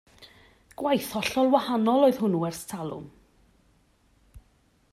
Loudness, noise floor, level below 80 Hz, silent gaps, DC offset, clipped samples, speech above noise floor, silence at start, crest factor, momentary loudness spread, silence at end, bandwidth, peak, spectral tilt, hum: -25 LUFS; -64 dBFS; -62 dBFS; none; under 0.1%; under 0.1%; 40 dB; 0.2 s; 22 dB; 14 LU; 0.55 s; 15 kHz; -6 dBFS; -5.5 dB/octave; none